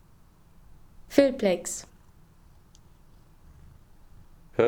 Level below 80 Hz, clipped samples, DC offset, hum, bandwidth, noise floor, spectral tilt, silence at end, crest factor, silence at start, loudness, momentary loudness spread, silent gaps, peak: -56 dBFS; under 0.1%; under 0.1%; none; over 20 kHz; -56 dBFS; -4.5 dB/octave; 0 s; 24 dB; 1 s; -26 LUFS; 14 LU; none; -6 dBFS